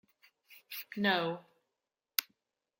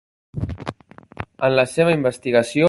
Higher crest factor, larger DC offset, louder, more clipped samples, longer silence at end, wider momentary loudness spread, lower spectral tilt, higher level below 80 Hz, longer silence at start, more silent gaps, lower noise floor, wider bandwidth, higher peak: first, 36 dB vs 18 dB; neither; second, -35 LUFS vs -20 LUFS; neither; first, 0.55 s vs 0 s; second, 15 LU vs 18 LU; second, -3.5 dB/octave vs -6 dB/octave; second, -88 dBFS vs -44 dBFS; first, 0.5 s vs 0.35 s; neither; first, -89 dBFS vs -43 dBFS; first, 16.5 kHz vs 11.5 kHz; about the same, -4 dBFS vs -2 dBFS